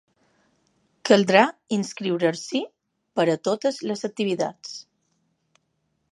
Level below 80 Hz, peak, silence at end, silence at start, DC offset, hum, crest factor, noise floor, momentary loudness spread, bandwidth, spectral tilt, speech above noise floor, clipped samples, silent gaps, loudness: -76 dBFS; -2 dBFS; 1.3 s; 1.05 s; under 0.1%; none; 24 dB; -73 dBFS; 16 LU; 11.5 kHz; -4.5 dB/octave; 51 dB; under 0.1%; none; -23 LUFS